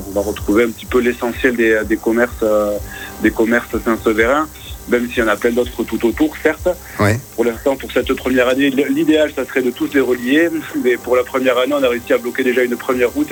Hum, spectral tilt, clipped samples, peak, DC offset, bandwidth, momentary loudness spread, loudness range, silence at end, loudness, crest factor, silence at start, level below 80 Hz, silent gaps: none; -5 dB/octave; under 0.1%; 0 dBFS; under 0.1%; 18 kHz; 5 LU; 2 LU; 0 s; -16 LUFS; 16 dB; 0 s; -38 dBFS; none